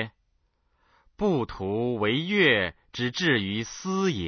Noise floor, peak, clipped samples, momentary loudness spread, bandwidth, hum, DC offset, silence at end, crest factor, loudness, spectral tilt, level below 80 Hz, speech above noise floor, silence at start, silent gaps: -71 dBFS; -8 dBFS; under 0.1%; 10 LU; 6.6 kHz; none; under 0.1%; 0 s; 18 dB; -26 LUFS; -5 dB/octave; -52 dBFS; 45 dB; 0 s; none